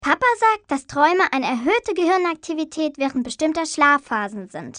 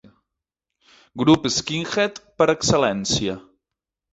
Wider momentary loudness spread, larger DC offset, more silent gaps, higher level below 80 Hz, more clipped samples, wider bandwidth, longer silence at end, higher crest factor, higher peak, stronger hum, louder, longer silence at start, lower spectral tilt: about the same, 9 LU vs 9 LU; neither; neither; second, -56 dBFS vs -50 dBFS; neither; first, 10 kHz vs 8.2 kHz; second, 0 s vs 0.7 s; about the same, 18 dB vs 20 dB; about the same, -2 dBFS vs -2 dBFS; neither; about the same, -20 LUFS vs -20 LUFS; second, 0 s vs 1.15 s; about the same, -3.5 dB/octave vs -4 dB/octave